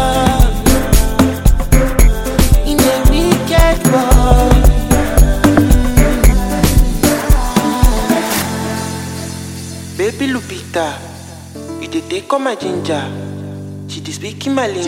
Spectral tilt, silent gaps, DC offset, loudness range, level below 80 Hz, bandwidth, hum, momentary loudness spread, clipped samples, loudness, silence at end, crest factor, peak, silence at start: -5 dB/octave; none; under 0.1%; 10 LU; -14 dBFS; 17 kHz; none; 15 LU; under 0.1%; -14 LUFS; 0 s; 12 dB; 0 dBFS; 0 s